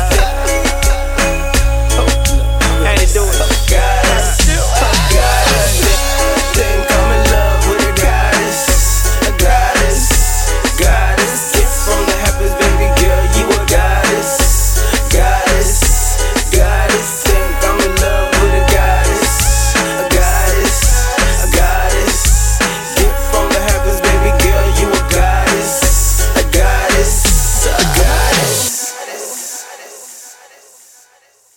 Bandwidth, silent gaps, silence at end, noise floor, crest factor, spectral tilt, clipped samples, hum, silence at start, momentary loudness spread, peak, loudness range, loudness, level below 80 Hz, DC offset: 18.5 kHz; none; 1.25 s; -50 dBFS; 12 dB; -3.5 dB/octave; under 0.1%; none; 0 s; 3 LU; 0 dBFS; 1 LU; -12 LUFS; -14 dBFS; under 0.1%